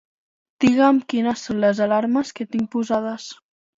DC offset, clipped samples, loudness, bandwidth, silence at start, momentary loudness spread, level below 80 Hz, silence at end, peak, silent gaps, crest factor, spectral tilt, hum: under 0.1%; under 0.1%; -20 LUFS; 7.8 kHz; 0.6 s; 10 LU; -60 dBFS; 0.45 s; -4 dBFS; none; 18 dB; -5.5 dB/octave; none